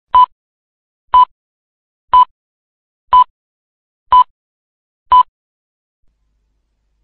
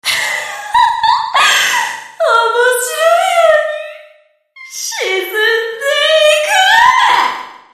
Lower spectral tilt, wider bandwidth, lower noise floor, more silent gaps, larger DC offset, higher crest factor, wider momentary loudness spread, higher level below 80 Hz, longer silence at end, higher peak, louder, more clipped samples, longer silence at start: first, -6 dB/octave vs 1 dB/octave; second, 4.3 kHz vs 15.5 kHz; first, -64 dBFS vs -48 dBFS; first, 0.32-1.08 s, 1.31-2.08 s, 2.31-3.08 s, 3.30-4.06 s, 4.30-5.06 s vs none; neither; about the same, 14 dB vs 12 dB; second, 5 LU vs 12 LU; first, -46 dBFS vs -56 dBFS; first, 1.8 s vs 0.15 s; about the same, -2 dBFS vs 0 dBFS; about the same, -12 LUFS vs -11 LUFS; neither; about the same, 0.15 s vs 0.05 s